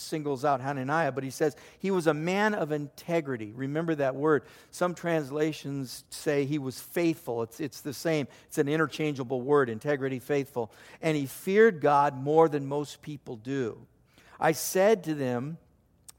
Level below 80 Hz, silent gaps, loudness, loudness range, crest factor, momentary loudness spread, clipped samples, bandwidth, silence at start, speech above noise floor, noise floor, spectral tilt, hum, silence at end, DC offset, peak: -70 dBFS; none; -29 LUFS; 4 LU; 20 dB; 12 LU; under 0.1%; 17 kHz; 0 s; 28 dB; -57 dBFS; -5.5 dB/octave; none; 0.6 s; under 0.1%; -8 dBFS